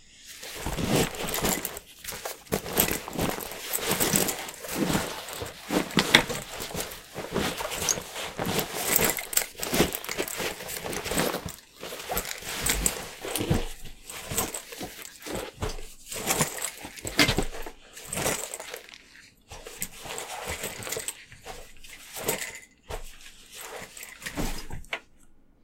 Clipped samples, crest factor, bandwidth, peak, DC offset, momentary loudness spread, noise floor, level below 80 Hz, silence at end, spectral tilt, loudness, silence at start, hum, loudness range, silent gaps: under 0.1%; 30 dB; 17 kHz; 0 dBFS; under 0.1%; 18 LU; -54 dBFS; -44 dBFS; 0.25 s; -2.5 dB/octave; -29 LUFS; 0 s; none; 10 LU; none